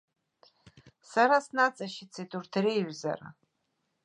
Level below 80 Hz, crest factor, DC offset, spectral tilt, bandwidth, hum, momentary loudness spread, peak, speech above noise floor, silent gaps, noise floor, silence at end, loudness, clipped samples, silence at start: -78 dBFS; 22 dB; under 0.1%; -5 dB/octave; 11 kHz; none; 16 LU; -10 dBFS; 50 dB; none; -79 dBFS; 0.75 s; -29 LUFS; under 0.1%; 1.1 s